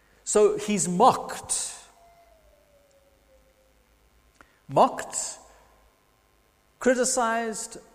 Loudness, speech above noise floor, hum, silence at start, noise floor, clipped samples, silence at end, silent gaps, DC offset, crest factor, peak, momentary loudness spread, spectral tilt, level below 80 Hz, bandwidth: -24 LUFS; 40 dB; none; 0.25 s; -64 dBFS; under 0.1%; 0.15 s; none; under 0.1%; 22 dB; -6 dBFS; 14 LU; -3.5 dB/octave; -60 dBFS; 15.5 kHz